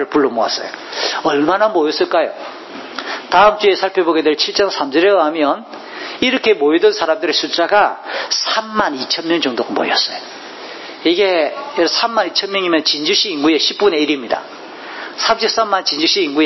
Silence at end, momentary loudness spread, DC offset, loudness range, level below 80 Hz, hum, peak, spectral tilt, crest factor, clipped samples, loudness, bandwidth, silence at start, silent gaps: 0 s; 15 LU; under 0.1%; 3 LU; -58 dBFS; none; 0 dBFS; -2.5 dB/octave; 16 dB; under 0.1%; -15 LUFS; 6.2 kHz; 0 s; none